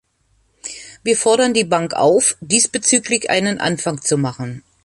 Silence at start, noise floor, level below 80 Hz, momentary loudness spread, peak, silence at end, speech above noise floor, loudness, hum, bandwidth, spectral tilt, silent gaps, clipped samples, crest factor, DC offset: 0.65 s; -61 dBFS; -56 dBFS; 16 LU; 0 dBFS; 0.25 s; 44 dB; -16 LUFS; none; 11.5 kHz; -3 dB/octave; none; under 0.1%; 18 dB; under 0.1%